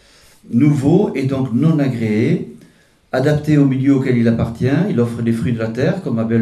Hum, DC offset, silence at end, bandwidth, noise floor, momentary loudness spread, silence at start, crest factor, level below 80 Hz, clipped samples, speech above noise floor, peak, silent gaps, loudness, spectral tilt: none; under 0.1%; 0 s; 12.5 kHz; -50 dBFS; 6 LU; 0.45 s; 14 dB; -46 dBFS; under 0.1%; 35 dB; -2 dBFS; none; -16 LUFS; -8.5 dB/octave